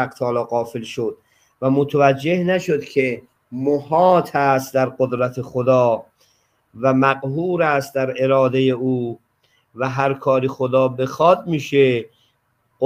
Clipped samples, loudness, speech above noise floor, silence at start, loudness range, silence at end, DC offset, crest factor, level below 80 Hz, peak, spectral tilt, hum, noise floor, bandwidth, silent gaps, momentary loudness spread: under 0.1%; -19 LUFS; 48 dB; 0 s; 2 LU; 0 s; under 0.1%; 18 dB; -62 dBFS; -2 dBFS; -7 dB/octave; none; -66 dBFS; 16 kHz; none; 9 LU